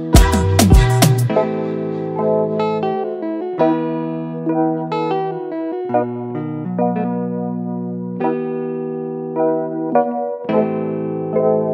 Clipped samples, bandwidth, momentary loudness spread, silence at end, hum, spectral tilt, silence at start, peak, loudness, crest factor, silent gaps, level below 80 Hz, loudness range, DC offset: under 0.1%; 16 kHz; 11 LU; 0 s; none; -6 dB/octave; 0 s; 0 dBFS; -19 LUFS; 18 dB; none; -26 dBFS; 5 LU; under 0.1%